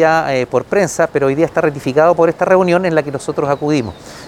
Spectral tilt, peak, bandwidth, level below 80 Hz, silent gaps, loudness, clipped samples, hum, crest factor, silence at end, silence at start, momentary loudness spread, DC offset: -6 dB/octave; 0 dBFS; 15.5 kHz; -48 dBFS; none; -14 LUFS; under 0.1%; none; 14 dB; 0 s; 0 s; 6 LU; under 0.1%